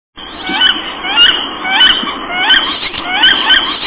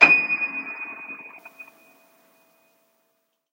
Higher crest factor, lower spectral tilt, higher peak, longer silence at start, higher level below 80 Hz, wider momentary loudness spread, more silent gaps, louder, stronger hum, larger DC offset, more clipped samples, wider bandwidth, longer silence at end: second, 12 dB vs 26 dB; first, -5 dB/octave vs -3.5 dB/octave; about the same, 0 dBFS vs 0 dBFS; first, 0.15 s vs 0 s; first, -42 dBFS vs under -90 dBFS; second, 10 LU vs 27 LU; neither; first, -9 LUFS vs -21 LUFS; neither; neither; first, 0.4% vs under 0.1%; second, 4 kHz vs 16 kHz; second, 0 s vs 1.9 s